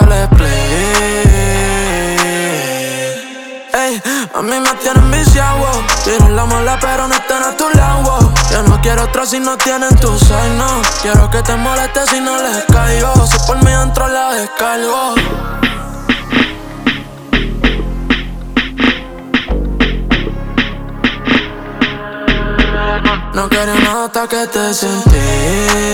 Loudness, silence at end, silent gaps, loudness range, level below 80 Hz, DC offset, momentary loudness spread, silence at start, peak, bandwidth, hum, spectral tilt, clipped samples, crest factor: -12 LUFS; 0 s; none; 4 LU; -16 dBFS; under 0.1%; 7 LU; 0 s; 0 dBFS; 19.5 kHz; none; -4.5 dB/octave; under 0.1%; 12 dB